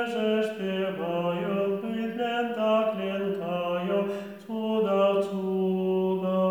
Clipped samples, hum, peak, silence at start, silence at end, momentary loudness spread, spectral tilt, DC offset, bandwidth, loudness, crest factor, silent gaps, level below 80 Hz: under 0.1%; none; -12 dBFS; 0 s; 0 s; 5 LU; -7.5 dB/octave; under 0.1%; 19.5 kHz; -27 LUFS; 14 dB; none; -76 dBFS